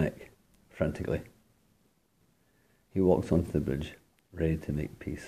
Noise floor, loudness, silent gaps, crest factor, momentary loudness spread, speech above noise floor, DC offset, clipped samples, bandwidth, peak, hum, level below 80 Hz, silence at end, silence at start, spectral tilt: -70 dBFS; -31 LUFS; none; 22 dB; 12 LU; 40 dB; under 0.1%; under 0.1%; 14.5 kHz; -10 dBFS; none; -50 dBFS; 0 s; 0 s; -8.5 dB/octave